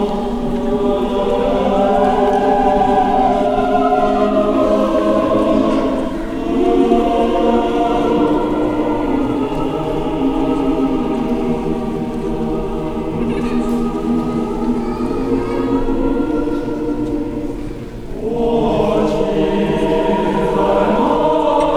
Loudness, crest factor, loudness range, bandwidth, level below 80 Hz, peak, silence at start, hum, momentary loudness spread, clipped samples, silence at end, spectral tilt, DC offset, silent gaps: -16 LUFS; 14 dB; 5 LU; 13.5 kHz; -30 dBFS; -2 dBFS; 0 s; none; 7 LU; under 0.1%; 0 s; -7 dB/octave; under 0.1%; none